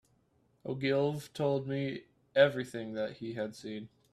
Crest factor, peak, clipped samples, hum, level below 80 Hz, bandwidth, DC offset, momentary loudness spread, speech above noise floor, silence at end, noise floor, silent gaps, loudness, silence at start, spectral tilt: 22 dB; -12 dBFS; under 0.1%; none; -72 dBFS; 13.5 kHz; under 0.1%; 16 LU; 39 dB; 0.25 s; -71 dBFS; none; -33 LUFS; 0.65 s; -6.5 dB/octave